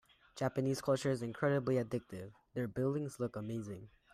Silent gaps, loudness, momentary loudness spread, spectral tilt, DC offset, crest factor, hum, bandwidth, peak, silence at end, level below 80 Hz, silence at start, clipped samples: none; -37 LUFS; 14 LU; -6.5 dB/octave; under 0.1%; 16 dB; none; 15 kHz; -20 dBFS; 0.25 s; -70 dBFS; 0.35 s; under 0.1%